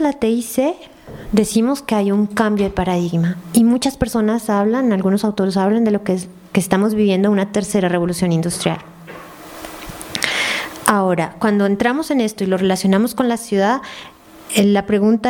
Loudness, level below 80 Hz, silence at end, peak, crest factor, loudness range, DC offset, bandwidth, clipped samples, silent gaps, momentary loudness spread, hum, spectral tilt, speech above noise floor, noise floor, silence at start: -17 LUFS; -44 dBFS; 0 s; 0 dBFS; 18 dB; 3 LU; under 0.1%; 18.5 kHz; under 0.1%; none; 14 LU; none; -5.5 dB/octave; 20 dB; -36 dBFS; 0 s